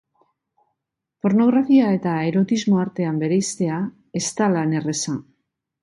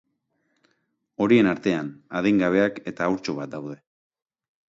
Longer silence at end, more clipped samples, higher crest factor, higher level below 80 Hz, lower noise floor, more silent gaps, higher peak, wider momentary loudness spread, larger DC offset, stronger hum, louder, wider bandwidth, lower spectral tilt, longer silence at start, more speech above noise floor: second, 0.6 s vs 0.95 s; neither; second, 14 dB vs 20 dB; about the same, -64 dBFS vs -62 dBFS; first, -80 dBFS vs -73 dBFS; neither; about the same, -6 dBFS vs -6 dBFS; second, 10 LU vs 17 LU; neither; neither; first, -20 LUFS vs -23 LUFS; first, 11.5 kHz vs 7.8 kHz; about the same, -5.5 dB/octave vs -6.5 dB/octave; about the same, 1.25 s vs 1.2 s; first, 61 dB vs 50 dB